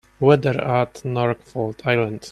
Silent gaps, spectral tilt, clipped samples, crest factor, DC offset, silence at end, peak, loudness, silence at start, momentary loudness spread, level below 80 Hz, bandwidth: none; -7 dB/octave; under 0.1%; 18 dB; under 0.1%; 0 s; -2 dBFS; -21 LUFS; 0.2 s; 8 LU; -54 dBFS; 12 kHz